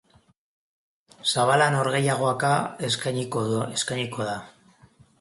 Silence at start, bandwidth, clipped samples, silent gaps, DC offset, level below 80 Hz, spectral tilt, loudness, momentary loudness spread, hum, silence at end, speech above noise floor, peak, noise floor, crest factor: 1.25 s; 11.5 kHz; under 0.1%; none; under 0.1%; -64 dBFS; -4 dB/octave; -24 LUFS; 9 LU; none; 0.7 s; 32 dB; -6 dBFS; -56 dBFS; 20 dB